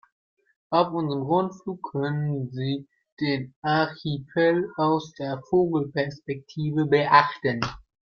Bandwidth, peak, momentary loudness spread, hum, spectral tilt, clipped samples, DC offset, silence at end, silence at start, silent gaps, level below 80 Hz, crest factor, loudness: 7 kHz; -2 dBFS; 11 LU; none; -7.5 dB/octave; under 0.1%; under 0.1%; 0.3 s; 0.7 s; 3.12-3.17 s, 3.56-3.62 s; -60 dBFS; 24 dB; -25 LUFS